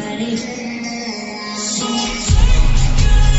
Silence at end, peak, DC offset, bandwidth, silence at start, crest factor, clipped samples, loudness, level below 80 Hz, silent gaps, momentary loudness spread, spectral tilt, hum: 0 s; -2 dBFS; under 0.1%; 8.2 kHz; 0 s; 12 dB; under 0.1%; -18 LUFS; -16 dBFS; none; 10 LU; -4 dB/octave; none